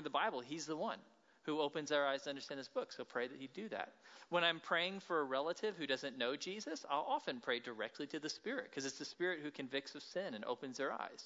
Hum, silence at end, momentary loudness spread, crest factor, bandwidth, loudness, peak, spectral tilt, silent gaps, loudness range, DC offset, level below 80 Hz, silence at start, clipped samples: none; 0 s; 9 LU; 22 dB; 7.6 kHz; -42 LUFS; -20 dBFS; -1.5 dB/octave; none; 4 LU; under 0.1%; under -90 dBFS; 0 s; under 0.1%